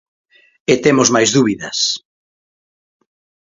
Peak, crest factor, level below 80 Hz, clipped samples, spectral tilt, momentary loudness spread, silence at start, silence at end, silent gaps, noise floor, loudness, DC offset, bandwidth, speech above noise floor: 0 dBFS; 18 dB; -56 dBFS; under 0.1%; -3.5 dB/octave; 9 LU; 0.7 s; 1.5 s; none; under -90 dBFS; -14 LUFS; under 0.1%; 7.8 kHz; over 76 dB